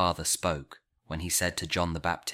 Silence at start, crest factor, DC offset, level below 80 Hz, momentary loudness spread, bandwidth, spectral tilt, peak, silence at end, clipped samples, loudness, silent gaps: 0 s; 18 dB; under 0.1%; -48 dBFS; 10 LU; 16.5 kHz; -3 dB/octave; -12 dBFS; 0 s; under 0.1%; -29 LUFS; none